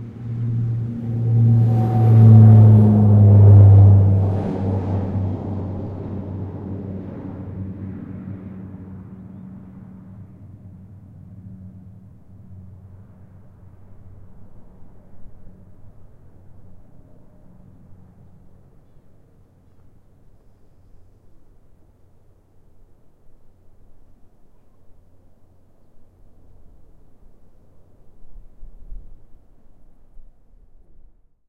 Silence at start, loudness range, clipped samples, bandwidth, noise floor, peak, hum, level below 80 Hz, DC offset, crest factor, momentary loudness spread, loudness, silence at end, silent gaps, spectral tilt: 0 s; 27 LU; under 0.1%; 2 kHz; -51 dBFS; 0 dBFS; none; -46 dBFS; under 0.1%; 20 dB; 30 LU; -15 LUFS; 1.3 s; none; -12 dB/octave